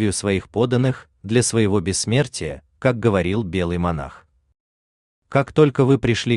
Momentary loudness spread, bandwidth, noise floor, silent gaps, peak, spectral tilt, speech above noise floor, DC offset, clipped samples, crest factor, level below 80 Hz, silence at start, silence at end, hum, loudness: 8 LU; 12.5 kHz; under -90 dBFS; 4.60-5.22 s; -4 dBFS; -5.5 dB/octave; over 71 dB; under 0.1%; under 0.1%; 18 dB; -46 dBFS; 0 s; 0 s; none; -20 LUFS